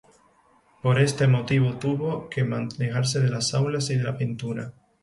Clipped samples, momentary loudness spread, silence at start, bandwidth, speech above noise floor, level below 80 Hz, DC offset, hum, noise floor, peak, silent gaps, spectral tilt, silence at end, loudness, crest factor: under 0.1%; 8 LU; 0.85 s; 11.5 kHz; 37 dB; -58 dBFS; under 0.1%; none; -60 dBFS; -8 dBFS; none; -5.5 dB/octave; 0.3 s; -25 LUFS; 16 dB